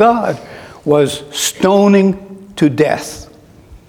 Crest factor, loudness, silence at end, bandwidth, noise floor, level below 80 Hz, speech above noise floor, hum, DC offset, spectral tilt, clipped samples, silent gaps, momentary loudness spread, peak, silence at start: 14 dB; -14 LUFS; 0.1 s; 17 kHz; -40 dBFS; -46 dBFS; 28 dB; none; under 0.1%; -5 dB/octave; under 0.1%; none; 18 LU; 0 dBFS; 0 s